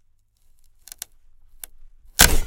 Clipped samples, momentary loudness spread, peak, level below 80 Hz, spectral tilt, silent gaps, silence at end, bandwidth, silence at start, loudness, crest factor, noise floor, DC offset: under 0.1%; 26 LU; 0 dBFS; -28 dBFS; -1.5 dB/octave; none; 0 s; 17 kHz; 2.2 s; -17 LUFS; 24 dB; -58 dBFS; under 0.1%